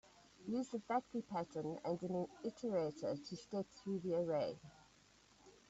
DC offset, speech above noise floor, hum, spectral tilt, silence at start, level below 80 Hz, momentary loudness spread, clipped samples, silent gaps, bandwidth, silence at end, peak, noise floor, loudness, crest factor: under 0.1%; 27 dB; none; -6.5 dB/octave; 0.4 s; -78 dBFS; 6 LU; under 0.1%; none; 8 kHz; 0.2 s; -26 dBFS; -69 dBFS; -43 LUFS; 16 dB